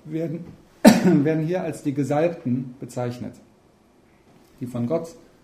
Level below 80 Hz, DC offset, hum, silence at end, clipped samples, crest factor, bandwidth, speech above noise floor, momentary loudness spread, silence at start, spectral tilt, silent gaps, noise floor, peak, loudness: -58 dBFS; under 0.1%; none; 0.3 s; under 0.1%; 24 dB; 15.5 kHz; 35 dB; 20 LU; 0.05 s; -6.5 dB/octave; none; -57 dBFS; 0 dBFS; -22 LUFS